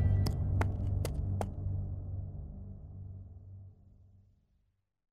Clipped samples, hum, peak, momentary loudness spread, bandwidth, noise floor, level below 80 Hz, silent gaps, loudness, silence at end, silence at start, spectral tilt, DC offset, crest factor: under 0.1%; none; -16 dBFS; 19 LU; 13 kHz; -77 dBFS; -42 dBFS; none; -36 LUFS; 1.1 s; 0 s; -7.5 dB/octave; under 0.1%; 20 dB